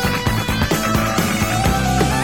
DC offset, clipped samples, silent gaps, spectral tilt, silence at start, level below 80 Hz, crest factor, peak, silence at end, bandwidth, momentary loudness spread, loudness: 0.9%; under 0.1%; none; -4.5 dB/octave; 0 s; -28 dBFS; 14 dB; -4 dBFS; 0 s; 19 kHz; 2 LU; -18 LUFS